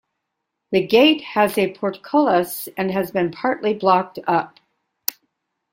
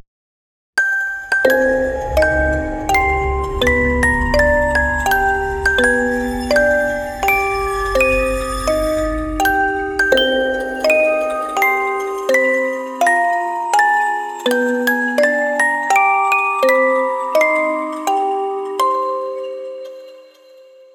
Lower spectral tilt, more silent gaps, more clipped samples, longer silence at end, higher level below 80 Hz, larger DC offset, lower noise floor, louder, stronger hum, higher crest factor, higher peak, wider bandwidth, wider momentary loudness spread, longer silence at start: about the same, -4.5 dB/octave vs -4 dB/octave; neither; neither; second, 0.6 s vs 0.75 s; second, -64 dBFS vs -30 dBFS; neither; first, -78 dBFS vs -44 dBFS; second, -20 LUFS vs -16 LUFS; neither; about the same, 20 dB vs 16 dB; about the same, 0 dBFS vs 0 dBFS; second, 16.5 kHz vs over 20 kHz; first, 12 LU vs 7 LU; about the same, 0.7 s vs 0.75 s